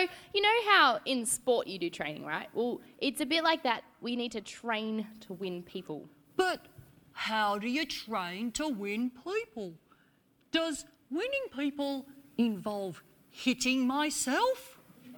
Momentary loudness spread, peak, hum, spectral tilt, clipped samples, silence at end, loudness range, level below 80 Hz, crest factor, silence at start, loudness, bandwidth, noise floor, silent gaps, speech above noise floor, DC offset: 14 LU; -10 dBFS; none; -2.5 dB/octave; under 0.1%; 0 s; 7 LU; -68 dBFS; 22 dB; 0 s; -32 LUFS; over 20 kHz; -68 dBFS; none; 36 dB; under 0.1%